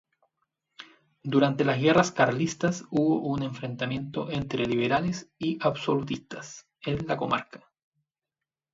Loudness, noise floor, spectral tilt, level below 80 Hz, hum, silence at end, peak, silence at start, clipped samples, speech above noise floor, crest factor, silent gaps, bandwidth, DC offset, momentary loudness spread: -27 LUFS; -89 dBFS; -5.5 dB/octave; -60 dBFS; none; 1.15 s; -6 dBFS; 0.8 s; under 0.1%; 63 dB; 22 dB; none; 7.8 kHz; under 0.1%; 13 LU